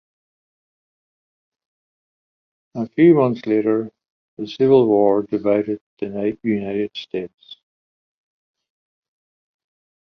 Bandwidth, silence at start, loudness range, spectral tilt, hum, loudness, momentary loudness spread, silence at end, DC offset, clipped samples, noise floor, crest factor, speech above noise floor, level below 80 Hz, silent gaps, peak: 6.2 kHz; 2.75 s; 12 LU; -9 dB/octave; none; -19 LUFS; 17 LU; 2.55 s; under 0.1%; under 0.1%; under -90 dBFS; 20 dB; over 72 dB; -62 dBFS; 4.10-4.37 s, 5.81-5.97 s; -2 dBFS